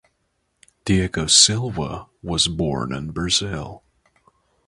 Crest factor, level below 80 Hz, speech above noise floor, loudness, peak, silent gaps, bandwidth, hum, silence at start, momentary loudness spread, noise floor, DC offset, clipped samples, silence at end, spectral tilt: 22 dB; -40 dBFS; 50 dB; -19 LUFS; 0 dBFS; none; 11.5 kHz; none; 0.85 s; 19 LU; -71 dBFS; under 0.1%; under 0.1%; 0.9 s; -3 dB/octave